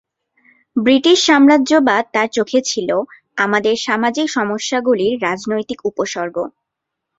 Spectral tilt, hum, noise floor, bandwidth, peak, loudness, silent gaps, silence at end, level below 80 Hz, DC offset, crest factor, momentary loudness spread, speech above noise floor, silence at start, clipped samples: -3.5 dB/octave; none; -79 dBFS; 7.8 kHz; 0 dBFS; -16 LUFS; none; 0.7 s; -60 dBFS; under 0.1%; 16 dB; 12 LU; 64 dB; 0.75 s; under 0.1%